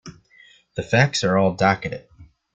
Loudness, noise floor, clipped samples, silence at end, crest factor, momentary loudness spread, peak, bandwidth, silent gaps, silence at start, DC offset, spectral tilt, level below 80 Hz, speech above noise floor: -20 LUFS; -53 dBFS; under 0.1%; 0.3 s; 20 dB; 16 LU; -2 dBFS; 9.2 kHz; none; 0.05 s; under 0.1%; -5 dB/octave; -52 dBFS; 33 dB